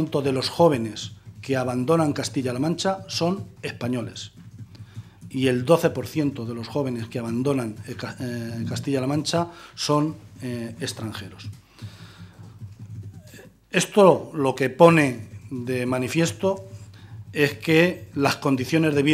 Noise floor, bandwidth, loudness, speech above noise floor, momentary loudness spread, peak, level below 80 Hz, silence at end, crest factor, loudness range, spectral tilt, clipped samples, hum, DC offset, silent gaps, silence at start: -47 dBFS; 15 kHz; -23 LUFS; 24 dB; 22 LU; 0 dBFS; -62 dBFS; 0 s; 24 dB; 9 LU; -5.5 dB/octave; under 0.1%; none; under 0.1%; none; 0 s